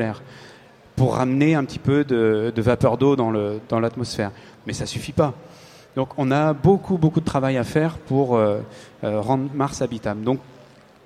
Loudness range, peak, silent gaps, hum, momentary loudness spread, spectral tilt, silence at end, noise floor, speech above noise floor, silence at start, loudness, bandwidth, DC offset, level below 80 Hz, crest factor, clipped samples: 4 LU; -4 dBFS; none; none; 11 LU; -7 dB/octave; 0.65 s; -48 dBFS; 28 dB; 0 s; -21 LUFS; 13.5 kHz; under 0.1%; -48 dBFS; 18 dB; under 0.1%